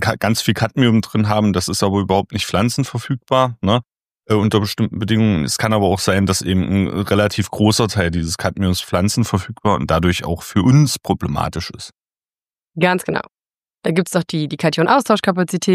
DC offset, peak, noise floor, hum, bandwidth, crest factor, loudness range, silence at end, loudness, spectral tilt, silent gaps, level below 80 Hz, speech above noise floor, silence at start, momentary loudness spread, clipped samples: under 0.1%; 0 dBFS; under -90 dBFS; none; 15.5 kHz; 16 dB; 3 LU; 0 s; -17 LUFS; -5.5 dB/octave; 4.11-4.15 s; -42 dBFS; over 73 dB; 0 s; 7 LU; under 0.1%